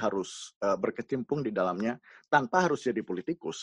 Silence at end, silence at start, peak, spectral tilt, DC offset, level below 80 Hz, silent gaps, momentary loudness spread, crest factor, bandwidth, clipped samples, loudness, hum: 0 s; 0 s; -10 dBFS; -5 dB/octave; under 0.1%; -68 dBFS; 0.56-0.61 s; 9 LU; 22 dB; 11 kHz; under 0.1%; -30 LUFS; none